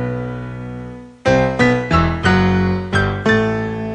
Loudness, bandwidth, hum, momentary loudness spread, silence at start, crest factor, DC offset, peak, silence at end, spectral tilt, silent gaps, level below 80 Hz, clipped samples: -16 LUFS; 9.6 kHz; none; 15 LU; 0 s; 16 dB; under 0.1%; 0 dBFS; 0 s; -7 dB/octave; none; -34 dBFS; under 0.1%